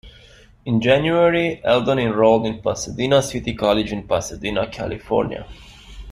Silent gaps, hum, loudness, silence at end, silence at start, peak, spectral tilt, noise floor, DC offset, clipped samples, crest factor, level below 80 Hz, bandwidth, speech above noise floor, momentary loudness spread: none; none; -19 LUFS; 0 s; 0.05 s; -2 dBFS; -5 dB/octave; -47 dBFS; under 0.1%; under 0.1%; 18 dB; -42 dBFS; 14.5 kHz; 28 dB; 10 LU